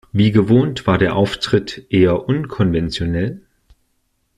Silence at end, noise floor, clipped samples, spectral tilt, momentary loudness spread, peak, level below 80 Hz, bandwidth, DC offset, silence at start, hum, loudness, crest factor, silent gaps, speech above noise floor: 1 s; -66 dBFS; under 0.1%; -7 dB/octave; 7 LU; -2 dBFS; -40 dBFS; 10.5 kHz; under 0.1%; 0.15 s; none; -17 LUFS; 14 dB; none; 50 dB